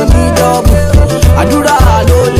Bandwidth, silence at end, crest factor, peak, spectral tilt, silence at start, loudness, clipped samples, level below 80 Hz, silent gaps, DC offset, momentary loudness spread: 15.5 kHz; 0 s; 6 dB; 0 dBFS; -6 dB/octave; 0 s; -8 LUFS; 2%; -12 dBFS; none; under 0.1%; 1 LU